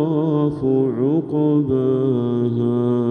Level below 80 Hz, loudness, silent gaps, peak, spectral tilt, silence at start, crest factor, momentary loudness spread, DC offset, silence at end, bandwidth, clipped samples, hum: -54 dBFS; -19 LUFS; none; -8 dBFS; -11 dB/octave; 0 s; 10 dB; 2 LU; under 0.1%; 0 s; 4 kHz; under 0.1%; none